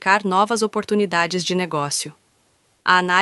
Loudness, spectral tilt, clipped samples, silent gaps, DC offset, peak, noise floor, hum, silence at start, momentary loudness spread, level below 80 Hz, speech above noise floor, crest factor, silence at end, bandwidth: -20 LUFS; -3.5 dB/octave; under 0.1%; none; under 0.1%; -2 dBFS; -62 dBFS; none; 0 s; 7 LU; -66 dBFS; 43 dB; 20 dB; 0 s; 12 kHz